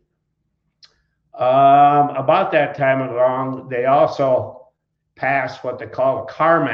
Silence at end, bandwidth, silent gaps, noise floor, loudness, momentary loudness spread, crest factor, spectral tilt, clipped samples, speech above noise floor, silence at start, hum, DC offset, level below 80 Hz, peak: 0 s; 6.6 kHz; none; -72 dBFS; -17 LUFS; 12 LU; 16 dB; -7.5 dB/octave; under 0.1%; 55 dB; 1.35 s; none; under 0.1%; -64 dBFS; -2 dBFS